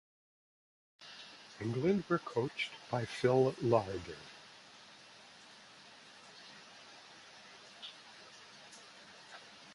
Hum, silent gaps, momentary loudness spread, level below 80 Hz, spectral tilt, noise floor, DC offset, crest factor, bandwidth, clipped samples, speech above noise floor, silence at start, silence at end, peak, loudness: none; none; 23 LU; -70 dBFS; -6 dB/octave; -58 dBFS; under 0.1%; 24 dB; 11.5 kHz; under 0.1%; 24 dB; 1 s; 0 s; -14 dBFS; -35 LUFS